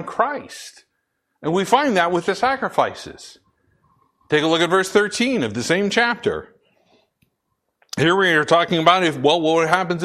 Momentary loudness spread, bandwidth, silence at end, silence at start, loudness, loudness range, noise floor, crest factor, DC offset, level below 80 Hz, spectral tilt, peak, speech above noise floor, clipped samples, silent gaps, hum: 15 LU; 14 kHz; 0 s; 0 s; -18 LUFS; 3 LU; -74 dBFS; 20 dB; under 0.1%; -58 dBFS; -4.5 dB/octave; 0 dBFS; 55 dB; under 0.1%; none; none